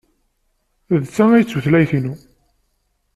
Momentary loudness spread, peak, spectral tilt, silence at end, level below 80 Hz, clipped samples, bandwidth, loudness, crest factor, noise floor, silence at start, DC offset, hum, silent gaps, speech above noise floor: 12 LU; -2 dBFS; -8 dB/octave; 1 s; -52 dBFS; under 0.1%; 13 kHz; -16 LUFS; 16 dB; -67 dBFS; 0.9 s; under 0.1%; none; none; 52 dB